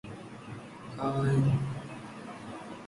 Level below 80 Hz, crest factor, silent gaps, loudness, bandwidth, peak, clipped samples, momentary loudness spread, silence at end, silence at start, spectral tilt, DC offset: -56 dBFS; 18 dB; none; -31 LUFS; 11.5 kHz; -16 dBFS; under 0.1%; 18 LU; 0 s; 0.05 s; -8 dB/octave; under 0.1%